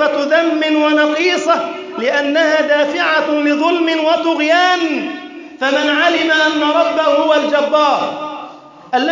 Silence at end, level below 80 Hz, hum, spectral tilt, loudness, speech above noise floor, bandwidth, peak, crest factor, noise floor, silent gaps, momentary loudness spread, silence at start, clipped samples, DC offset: 0 s; -68 dBFS; none; -2.5 dB/octave; -14 LUFS; 21 dB; 7.6 kHz; -2 dBFS; 12 dB; -35 dBFS; none; 9 LU; 0 s; under 0.1%; under 0.1%